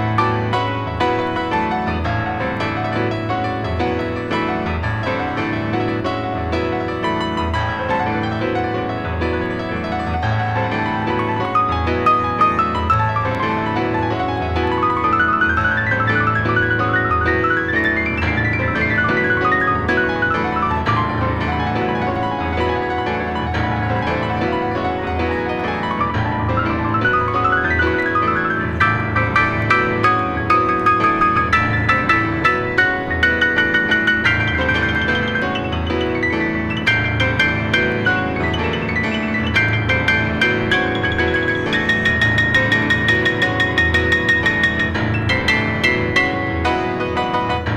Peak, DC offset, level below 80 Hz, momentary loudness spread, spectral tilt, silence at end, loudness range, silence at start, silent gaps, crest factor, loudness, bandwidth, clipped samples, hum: -2 dBFS; under 0.1%; -34 dBFS; 6 LU; -6.5 dB/octave; 0 s; 5 LU; 0 s; none; 16 dB; -17 LUFS; 10.5 kHz; under 0.1%; none